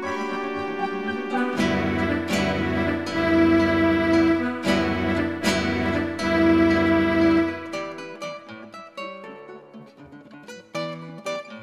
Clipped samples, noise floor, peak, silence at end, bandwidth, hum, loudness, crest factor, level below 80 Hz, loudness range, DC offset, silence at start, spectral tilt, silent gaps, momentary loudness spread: under 0.1%; -45 dBFS; -8 dBFS; 0 s; 13.5 kHz; none; -22 LUFS; 16 dB; -48 dBFS; 15 LU; under 0.1%; 0 s; -6 dB/octave; none; 18 LU